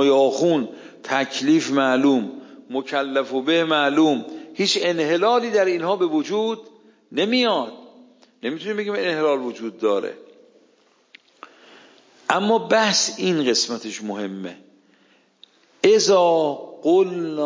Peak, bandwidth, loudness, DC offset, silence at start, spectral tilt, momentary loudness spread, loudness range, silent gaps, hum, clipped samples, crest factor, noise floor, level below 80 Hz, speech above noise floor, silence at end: -2 dBFS; 7.6 kHz; -20 LUFS; under 0.1%; 0 s; -3.5 dB/octave; 13 LU; 6 LU; none; none; under 0.1%; 20 dB; -59 dBFS; -78 dBFS; 39 dB; 0 s